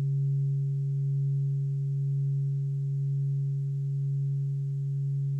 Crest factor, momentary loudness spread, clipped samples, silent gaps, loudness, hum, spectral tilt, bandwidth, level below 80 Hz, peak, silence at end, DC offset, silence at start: 6 dB; 3 LU; under 0.1%; none; -30 LUFS; none; -11.5 dB/octave; 0.4 kHz; -82 dBFS; -24 dBFS; 0 s; under 0.1%; 0 s